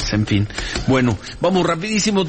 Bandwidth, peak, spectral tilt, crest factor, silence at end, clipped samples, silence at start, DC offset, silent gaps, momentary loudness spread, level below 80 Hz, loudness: 8.8 kHz; -6 dBFS; -5 dB/octave; 12 dB; 0 s; under 0.1%; 0 s; 0.3%; none; 5 LU; -34 dBFS; -19 LUFS